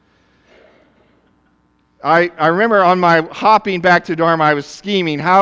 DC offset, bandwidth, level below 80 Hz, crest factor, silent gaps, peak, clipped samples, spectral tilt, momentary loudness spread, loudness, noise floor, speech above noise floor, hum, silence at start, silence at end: under 0.1%; 8 kHz; -58 dBFS; 14 dB; none; 0 dBFS; under 0.1%; -6 dB/octave; 6 LU; -14 LUFS; -58 dBFS; 45 dB; none; 2.05 s; 0 s